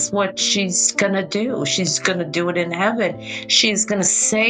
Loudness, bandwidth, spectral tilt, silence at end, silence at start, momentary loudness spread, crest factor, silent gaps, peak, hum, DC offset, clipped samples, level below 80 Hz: -18 LUFS; 10.5 kHz; -2 dB/octave; 0 s; 0 s; 6 LU; 18 dB; none; -2 dBFS; none; under 0.1%; under 0.1%; -60 dBFS